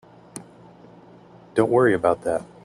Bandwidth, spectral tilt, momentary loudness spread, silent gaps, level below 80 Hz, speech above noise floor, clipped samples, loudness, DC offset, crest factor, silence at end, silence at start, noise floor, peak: 12 kHz; -6.5 dB/octave; 23 LU; none; -60 dBFS; 28 dB; under 0.1%; -21 LUFS; under 0.1%; 20 dB; 0.2 s; 0.35 s; -48 dBFS; -4 dBFS